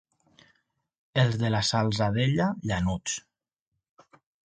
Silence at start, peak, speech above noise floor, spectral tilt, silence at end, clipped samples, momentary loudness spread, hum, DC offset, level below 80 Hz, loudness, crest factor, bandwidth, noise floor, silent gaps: 1.15 s; -10 dBFS; 58 dB; -5 dB/octave; 1.25 s; under 0.1%; 7 LU; none; under 0.1%; -50 dBFS; -27 LUFS; 18 dB; 9.4 kHz; -84 dBFS; none